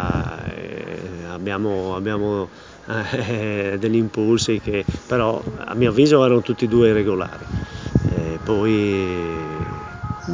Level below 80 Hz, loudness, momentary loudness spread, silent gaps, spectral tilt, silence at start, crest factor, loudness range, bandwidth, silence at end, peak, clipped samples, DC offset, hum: -38 dBFS; -21 LUFS; 15 LU; none; -6.5 dB/octave; 0 s; 18 dB; 7 LU; 7.6 kHz; 0 s; -2 dBFS; under 0.1%; under 0.1%; none